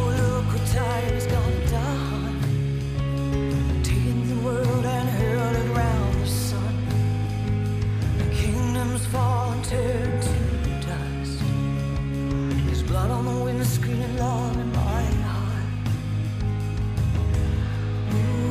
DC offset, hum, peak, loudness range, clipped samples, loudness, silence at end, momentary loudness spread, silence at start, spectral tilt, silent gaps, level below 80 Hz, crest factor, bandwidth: under 0.1%; none; -12 dBFS; 2 LU; under 0.1%; -25 LUFS; 0 s; 4 LU; 0 s; -6.5 dB/octave; none; -30 dBFS; 12 dB; 15.5 kHz